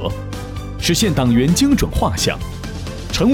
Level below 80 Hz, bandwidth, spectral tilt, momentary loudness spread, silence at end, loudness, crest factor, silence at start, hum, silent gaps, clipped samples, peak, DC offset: -28 dBFS; 18 kHz; -5 dB/octave; 14 LU; 0 s; -17 LUFS; 14 dB; 0 s; none; none; under 0.1%; -4 dBFS; under 0.1%